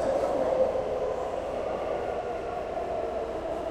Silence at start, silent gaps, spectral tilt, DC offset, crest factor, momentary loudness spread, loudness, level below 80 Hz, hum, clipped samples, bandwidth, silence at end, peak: 0 s; none; -6 dB/octave; under 0.1%; 16 dB; 6 LU; -30 LUFS; -50 dBFS; none; under 0.1%; 11.5 kHz; 0 s; -14 dBFS